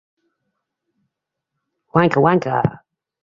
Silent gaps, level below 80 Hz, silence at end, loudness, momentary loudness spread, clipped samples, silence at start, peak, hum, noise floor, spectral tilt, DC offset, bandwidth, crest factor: none; -54 dBFS; 0.5 s; -17 LUFS; 6 LU; under 0.1%; 1.95 s; 0 dBFS; none; -80 dBFS; -8.5 dB/octave; under 0.1%; 7.4 kHz; 20 dB